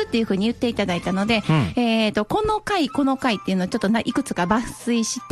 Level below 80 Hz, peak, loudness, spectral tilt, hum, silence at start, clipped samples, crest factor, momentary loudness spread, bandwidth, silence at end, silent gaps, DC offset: -46 dBFS; -4 dBFS; -22 LUFS; -5 dB/octave; none; 0 s; under 0.1%; 16 dB; 4 LU; 12.5 kHz; 0 s; none; under 0.1%